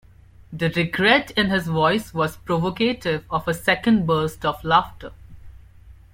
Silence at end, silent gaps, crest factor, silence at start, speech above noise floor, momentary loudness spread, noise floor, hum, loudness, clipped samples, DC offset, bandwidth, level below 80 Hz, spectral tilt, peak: 0.2 s; none; 20 dB; 0.4 s; 26 dB; 9 LU; -47 dBFS; none; -21 LUFS; under 0.1%; under 0.1%; 16.5 kHz; -46 dBFS; -5.5 dB/octave; -2 dBFS